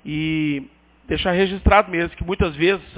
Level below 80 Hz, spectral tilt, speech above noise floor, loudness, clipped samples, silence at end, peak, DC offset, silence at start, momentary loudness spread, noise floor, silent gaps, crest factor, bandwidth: -30 dBFS; -10 dB/octave; 21 dB; -20 LUFS; under 0.1%; 0 s; 0 dBFS; under 0.1%; 0.05 s; 9 LU; -40 dBFS; none; 20 dB; 4 kHz